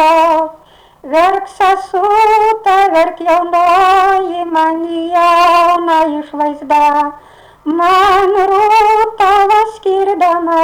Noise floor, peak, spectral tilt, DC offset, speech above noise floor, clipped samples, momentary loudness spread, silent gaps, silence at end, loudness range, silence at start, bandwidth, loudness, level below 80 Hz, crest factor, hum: -42 dBFS; -4 dBFS; -3.5 dB/octave; under 0.1%; 32 dB; under 0.1%; 7 LU; none; 0 s; 1 LU; 0 s; over 20 kHz; -11 LUFS; -44 dBFS; 6 dB; none